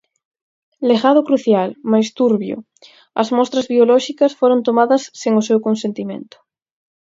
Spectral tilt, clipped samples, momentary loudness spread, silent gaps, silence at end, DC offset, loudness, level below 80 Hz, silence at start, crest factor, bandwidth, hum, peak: -5.5 dB/octave; under 0.1%; 12 LU; none; 0.8 s; under 0.1%; -16 LUFS; -68 dBFS; 0.8 s; 16 dB; 7.8 kHz; none; 0 dBFS